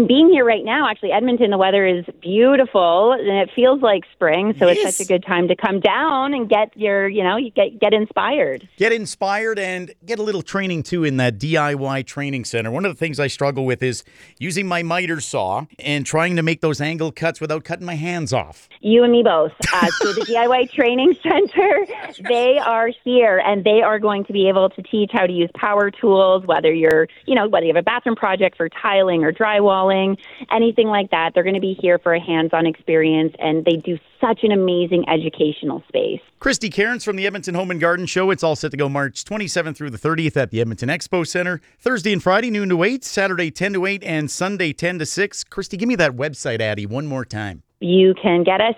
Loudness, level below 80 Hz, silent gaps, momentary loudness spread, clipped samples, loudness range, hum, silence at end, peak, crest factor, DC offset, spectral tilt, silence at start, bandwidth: -18 LUFS; -54 dBFS; none; 9 LU; under 0.1%; 5 LU; none; 0 s; -2 dBFS; 16 dB; under 0.1%; -5 dB/octave; 0 s; 14 kHz